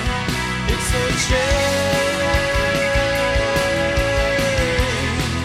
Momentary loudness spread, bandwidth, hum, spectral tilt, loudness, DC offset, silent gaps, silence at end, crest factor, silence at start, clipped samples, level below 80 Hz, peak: 3 LU; 16 kHz; none; -4 dB/octave; -18 LUFS; under 0.1%; none; 0 s; 14 dB; 0 s; under 0.1%; -26 dBFS; -4 dBFS